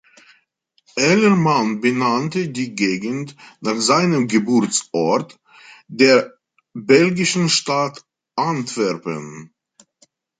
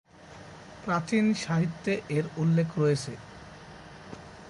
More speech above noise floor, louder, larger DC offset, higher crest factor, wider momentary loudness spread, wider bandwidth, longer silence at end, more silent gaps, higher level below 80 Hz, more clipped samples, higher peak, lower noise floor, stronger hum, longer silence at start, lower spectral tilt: first, 46 dB vs 21 dB; first, -18 LUFS vs -28 LUFS; neither; about the same, 18 dB vs 16 dB; second, 16 LU vs 21 LU; second, 9.6 kHz vs 11.5 kHz; first, 0.95 s vs 0 s; neither; about the same, -64 dBFS vs -60 dBFS; neither; first, -2 dBFS vs -14 dBFS; first, -64 dBFS vs -48 dBFS; neither; first, 0.95 s vs 0.2 s; second, -4.5 dB/octave vs -6.5 dB/octave